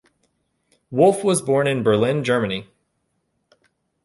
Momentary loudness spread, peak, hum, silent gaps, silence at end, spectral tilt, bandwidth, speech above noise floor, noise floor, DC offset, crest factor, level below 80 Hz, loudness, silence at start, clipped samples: 10 LU; -4 dBFS; none; none; 1.4 s; -5.5 dB/octave; 11.5 kHz; 53 dB; -72 dBFS; under 0.1%; 18 dB; -60 dBFS; -19 LUFS; 0.9 s; under 0.1%